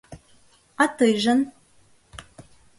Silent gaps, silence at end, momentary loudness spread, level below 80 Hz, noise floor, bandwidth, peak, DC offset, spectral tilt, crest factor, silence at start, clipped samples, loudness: none; 0.4 s; 25 LU; -58 dBFS; -57 dBFS; 11.5 kHz; -6 dBFS; under 0.1%; -4 dB/octave; 20 dB; 0.1 s; under 0.1%; -21 LUFS